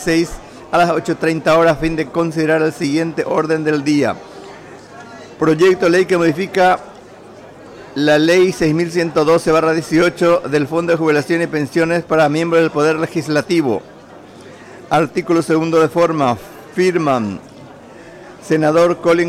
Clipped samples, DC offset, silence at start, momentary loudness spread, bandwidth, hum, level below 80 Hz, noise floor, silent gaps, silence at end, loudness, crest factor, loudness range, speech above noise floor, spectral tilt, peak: under 0.1%; under 0.1%; 0 s; 10 LU; 15 kHz; none; -46 dBFS; -38 dBFS; none; 0 s; -15 LUFS; 10 dB; 3 LU; 24 dB; -6 dB/octave; -6 dBFS